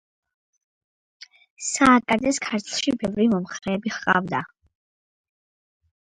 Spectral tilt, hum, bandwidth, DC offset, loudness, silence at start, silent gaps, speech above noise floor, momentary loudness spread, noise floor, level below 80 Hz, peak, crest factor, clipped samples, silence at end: -4 dB/octave; none; 11.5 kHz; under 0.1%; -22 LUFS; 1.6 s; none; over 68 dB; 12 LU; under -90 dBFS; -56 dBFS; -2 dBFS; 24 dB; under 0.1%; 1.55 s